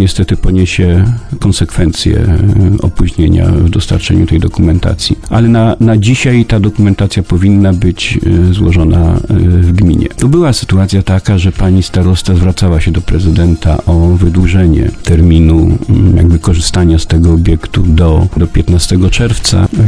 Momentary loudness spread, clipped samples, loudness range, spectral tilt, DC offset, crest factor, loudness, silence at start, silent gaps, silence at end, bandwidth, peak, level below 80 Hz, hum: 4 LU; 0.9%; 2 LU; -6.5 dB/octave; 2%; 8 dB; -9 LUFS; 0 s; none; 0 s; 11 kHz; 0 dBFS; -16 dBFS; none